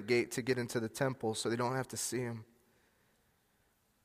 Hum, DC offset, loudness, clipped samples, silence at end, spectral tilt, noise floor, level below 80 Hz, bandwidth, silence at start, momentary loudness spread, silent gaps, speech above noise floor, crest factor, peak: none; under 0.1%; -36 LUFS; under 0.1%; 1.6 s; -4.5 dB/octave; -74 dBFS; -74 dBFS; 15.5 kHz; 0 s; 6 LU; none; 39 dB; 20 dB; -18 dBFS